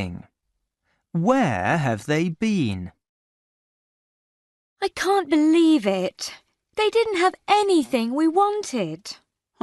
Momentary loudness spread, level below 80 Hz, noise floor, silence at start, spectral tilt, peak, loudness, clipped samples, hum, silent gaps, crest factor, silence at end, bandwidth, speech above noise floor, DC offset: 15 LU; -60 dBFS; -78 dBFS; 0 s; -5.5 dB/octave; -6 dBFS; -21 LUFS; under 0.1%; none; 3.09-4.76 s; 16 dB; 0.5 s; 12 kHz; 57 dB; under 0.1%